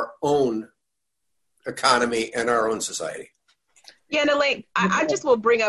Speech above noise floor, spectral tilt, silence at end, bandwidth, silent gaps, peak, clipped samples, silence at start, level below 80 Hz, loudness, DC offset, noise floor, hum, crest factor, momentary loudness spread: 60 dB; -3.5 dB/octave; 0 s; 12.5 kHz; none; -4 dBFS; under 0.1%; 0 s; -62 dBFS; -22 LUFS; under 0.1%; -82 dBFS; none; 20 dB; 13 LU